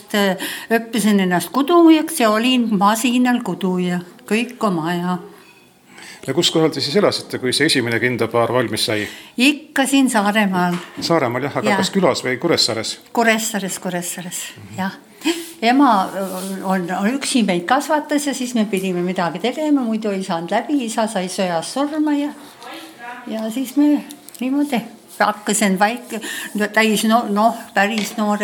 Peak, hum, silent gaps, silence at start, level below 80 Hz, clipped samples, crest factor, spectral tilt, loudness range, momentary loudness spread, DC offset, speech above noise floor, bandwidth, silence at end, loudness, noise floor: -2 dBFS; none; none; 0.1 s; -66 dBFS; under 0.1%; 16 dB; -4 dB/octave; 5 LU; 10 LU; under 0.1%; 30 dB; 19.5 kHz; 0 s; -18 LUFS; -48 dBFS